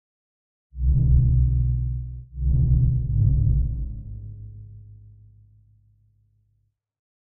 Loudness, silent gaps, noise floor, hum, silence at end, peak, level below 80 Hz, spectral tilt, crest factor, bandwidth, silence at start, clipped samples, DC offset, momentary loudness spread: -23 LUFS; none; -70 dBFS; none; 2.3 s; -6 dBFS; -26 dBFS; -20 dB/octave; 16 dB; 0.8 kHz; 0.75 s; under 0.1%; under 0.1%; 20 LU